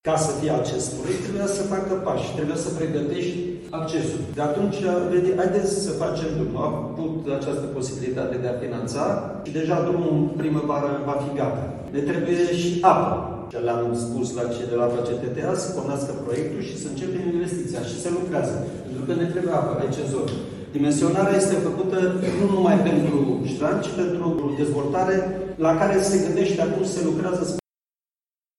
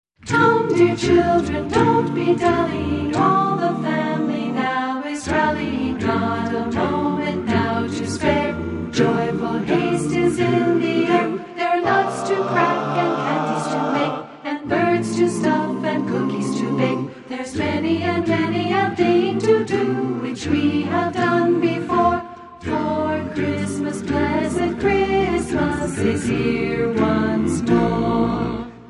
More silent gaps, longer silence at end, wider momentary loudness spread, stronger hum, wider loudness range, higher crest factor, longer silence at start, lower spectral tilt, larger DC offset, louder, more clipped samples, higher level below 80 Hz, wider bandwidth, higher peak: neither; first, 1 s vs 0 s; about the same, 8 LU vs 6 LU; neither; first, 5 LU vs 2 LU; about the same, 20 dB vs 16 dB; second, 0.05 s vs 0.25 s; about the same, -6 dB/octave vs -6 dB/octave; neither; second, -24 LUFS vs -20 LUFS; neither; second, -52 dBFS vs -42 dBFS; about the same, 12 kHz vs 11.5 kHz; about the same, -2 dBFS vs -2 dBFS